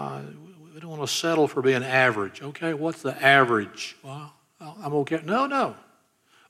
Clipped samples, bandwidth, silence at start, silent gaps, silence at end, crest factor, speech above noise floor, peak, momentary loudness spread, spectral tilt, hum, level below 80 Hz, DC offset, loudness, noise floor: under 0.1%; 15 kHz; 0 s; none; 0.75 s; 22 dB; 38 dB; -4 dBFS; 21 LU; -4.5 dB/octave; none; -78 dBFS; under 0.1%; -23 LUFS; -62 dBFS